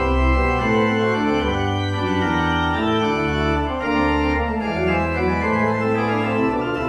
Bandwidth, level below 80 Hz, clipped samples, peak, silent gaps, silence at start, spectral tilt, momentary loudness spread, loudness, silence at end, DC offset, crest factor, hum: 10 kHz; -30 dBFS; under 0.1%; -6 dBFS; none; 0 s; -7 dB/octave; 3 LU; -20 LUFS; 0 s; under 0.1%; 14 dB; none